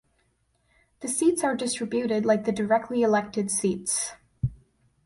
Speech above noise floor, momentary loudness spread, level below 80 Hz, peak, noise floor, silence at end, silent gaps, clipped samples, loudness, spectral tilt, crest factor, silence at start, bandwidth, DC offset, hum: 44 dB; 10 LU; -54 dBFS; -8 dBFS; -69 dBFS; 0.5 s; none; under 0.1%; -26 LUFS; -4.5 dB/octave; 18 dB; 1 s; 11.5 kHz; under 0.1%; none